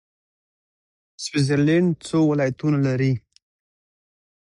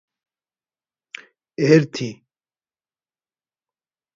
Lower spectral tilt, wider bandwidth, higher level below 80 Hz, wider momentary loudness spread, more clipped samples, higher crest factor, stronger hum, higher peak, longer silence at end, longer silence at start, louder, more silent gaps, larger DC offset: about the same, -6.5 dB/octave vs -6.5 dB/octave; first, 11 kHz vs 7.6 kHz; first, -58 dBFS vs -70 dBFS; second, 8 LU vs 23 LU; neither; second, 14 dB vs 24 dB; neither; second, -8 dBFS vs 0 dBFS; second, 1.3 s vs 2.05 s; second, 1.2 s vs 1.6 s; second, -21 LUFS vs -18 LUFS; neither; neither